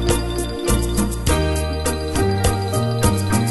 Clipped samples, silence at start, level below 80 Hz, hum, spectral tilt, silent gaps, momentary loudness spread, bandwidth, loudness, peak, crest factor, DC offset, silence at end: under 0.1%; 0 s; -26 dBFS; none; -5 dB/octave; none; 3 LU; 12.5 kHz; -20 LUFS; -4 dBFS; 16 dB; under 0.1%; 0 s